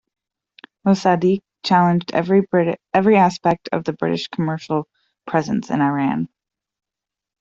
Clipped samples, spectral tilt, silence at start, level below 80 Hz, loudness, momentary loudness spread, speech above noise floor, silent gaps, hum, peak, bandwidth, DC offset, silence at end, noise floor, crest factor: under 0.1%; -7 dB/octave; 0.85 s; -60 dBFS; -19 LUFS; 9 LU; 69 dB; none; none; -4 dBFS; 7.6 kHz; under 0.1%; 1.15 s; -86 dBFS; 16 dB